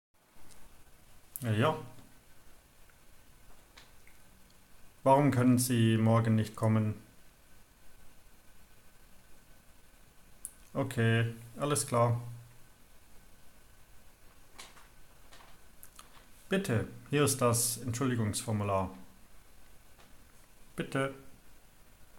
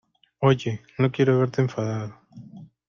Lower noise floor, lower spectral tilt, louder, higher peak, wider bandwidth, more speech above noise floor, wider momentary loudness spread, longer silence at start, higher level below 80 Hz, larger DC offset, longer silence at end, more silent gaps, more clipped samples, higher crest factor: first, -58 dBFS vs -45 dBFS; second, -5.5 dB/octave vs -7.5 dB/octave; second, -31 LUFS vs -24 LUFS; second, -12 dBFS vs -6 dBFS; first, 17 kHz vs 7.2 kHz; first, 29 dB vs 22 dB; first, 25 LU vs 12 LU; about the same, 0.35 s vs 0.4 s; about the same, -62 dBFS vs -60 dBFS; neither; second, 0 s vs 0.25 s; neither; neither; about the same, 22 dB vs 18 dB